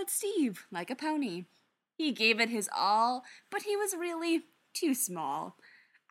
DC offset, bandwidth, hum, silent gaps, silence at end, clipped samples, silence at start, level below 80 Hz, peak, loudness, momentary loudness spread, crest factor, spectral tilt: under 0.1%; 17 kHz; none; none; 0.6 s; under 0.1%; 0 s; under -90 dBFS; -12 dBFS; -32 LUFS; 12 LU; 20 dB; -2.5 dB/octave